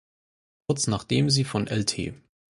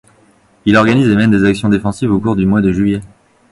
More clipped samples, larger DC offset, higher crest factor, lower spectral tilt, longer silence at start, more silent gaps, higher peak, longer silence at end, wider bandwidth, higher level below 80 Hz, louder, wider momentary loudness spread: neither; neither; first, 18 dB vs 12 dB; second, -4.5 dB/octave vs -7 dB/octave; about the same, 0.7 s vs 0.65 s; neither; second, -8 dBFS vs 0 dBFS; about the same, 0.4 s vs 0.45 s; about the same, 11.5 kHz vs 11.5 kHz; second, -52 dBFS vs -38 dBFS; second, -25 LUFS vs -13 LUFS; first, 12 LU vs 6 LU